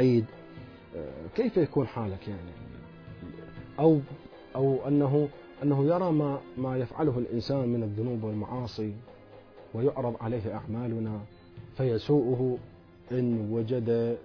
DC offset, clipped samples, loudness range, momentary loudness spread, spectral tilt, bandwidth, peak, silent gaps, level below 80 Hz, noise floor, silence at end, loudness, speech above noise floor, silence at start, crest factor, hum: under 0.1%; under 0.1%; 6 LU; 19 LU; -10 dB/octave; 5.4 kHz; -12 dBFS; none; -58 dBFS; -51 dBFS; 0 s; -29 LUFS; 23 dB; 0 s; 18 dB; none